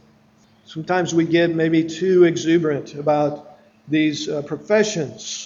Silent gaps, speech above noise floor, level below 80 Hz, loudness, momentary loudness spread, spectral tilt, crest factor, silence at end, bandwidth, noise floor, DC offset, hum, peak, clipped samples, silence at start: none; 36 dB; -64 dBFS; -19 LUFS; 11 LU; -5.5 dB/octave; 16 dB; 0 s; 7.6 kHz; -55 dBFS; under 0.1%; none; -4 dBFS; under 0.1%; 0.7 s